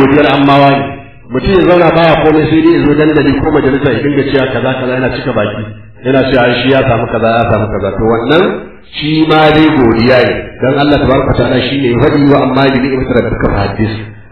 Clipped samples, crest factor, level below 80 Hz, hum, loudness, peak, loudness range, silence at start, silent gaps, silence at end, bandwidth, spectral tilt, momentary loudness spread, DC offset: 0.6%; 10 dB; -28 dBFS; none; -9 LUFS; 0 dBFS; 3 LU; 0 s; none; 0.1 s; 5.4 kHz; -9.5 dB/octave; 8 LU; 1%